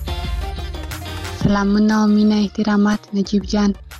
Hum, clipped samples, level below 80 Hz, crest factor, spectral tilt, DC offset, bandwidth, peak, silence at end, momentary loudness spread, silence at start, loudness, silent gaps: none; under 0.1%; -30 dBFS; 14 dB; -6.5 dB/octave; under 0.1%; 13 kHz; -4 dBFS; 0 s; 14 LU; 0 s; -18 LUFS; none